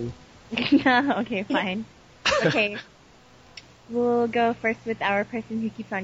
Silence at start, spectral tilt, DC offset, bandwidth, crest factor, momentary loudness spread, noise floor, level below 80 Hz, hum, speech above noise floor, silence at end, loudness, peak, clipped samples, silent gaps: 0 s; -5 dB/octave; under 0.1%; 8 kHz; 18 dB; 12 LU; -53 dBFS; -56 dBFS; none; 28 dB; 0 s; -24 LUFS; -8 dBFS; under 0.1%; none